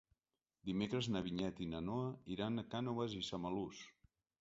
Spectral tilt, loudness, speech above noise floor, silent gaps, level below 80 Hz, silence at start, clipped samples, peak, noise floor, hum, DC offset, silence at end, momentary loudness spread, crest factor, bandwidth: -5.5 dB/octave; -43 LUFS; over 48 dB; none; -66 dBFS; 0.65 s; under 0.1%; -26 dBFS; under -90 dBFS; none; under 0.1%; 0.5 s; 7 LU; 18 dB; 7.6 kHz